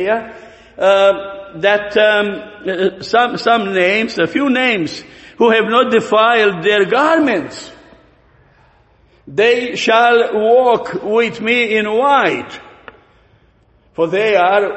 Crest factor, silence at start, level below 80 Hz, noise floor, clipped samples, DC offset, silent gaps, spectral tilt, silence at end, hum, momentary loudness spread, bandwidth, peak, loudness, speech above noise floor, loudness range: 14 dB; 0 s; -54 dBFS; -52 dBFS; under 0.1%; under 0.1%; none; -4.5 dB/octave; 0 s; none; 12 LU; 8.4 kHz; 0 dBFS; -14 LUFS; 39 dB; 4 LU